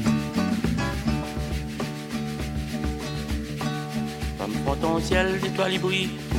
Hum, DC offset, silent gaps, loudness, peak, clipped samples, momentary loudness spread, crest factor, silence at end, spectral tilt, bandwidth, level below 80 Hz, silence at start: none; under 0.1%; none; -27 LUFS; -6 dBFS; under 0.1%; 8 LU; 20 dB; 0 s; -5.5 dB/octave; 16.5 kHz; -36 dBFS; 0 s